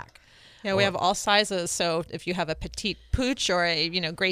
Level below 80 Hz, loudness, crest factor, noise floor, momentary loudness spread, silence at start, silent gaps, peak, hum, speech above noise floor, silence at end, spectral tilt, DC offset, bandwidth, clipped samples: -44 dBFS; -25 LUFS; 22 dB; -54 dBFS; 9 LU; 0 s; none; -6 dBFS; none; 28 dB; 0 s; -3 dB/octave; under 0.1%; 15.5 kHz; under 0.1%